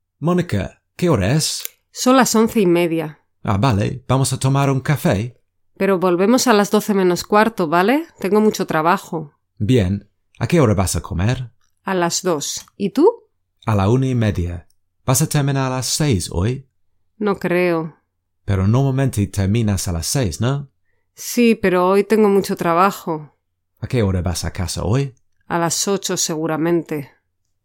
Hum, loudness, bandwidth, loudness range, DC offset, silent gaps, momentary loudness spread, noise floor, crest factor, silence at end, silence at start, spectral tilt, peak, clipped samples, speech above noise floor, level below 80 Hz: none; -18 LUFS; 17 kHz; 4 LU; under 0.1%; none; 12 LU; -66 dBFS; 18 dB; 0.6 s; 0.2 s; -5.5 dB/octave; 0 dBFS; under 0.1%; 49 dB; -42 dBFS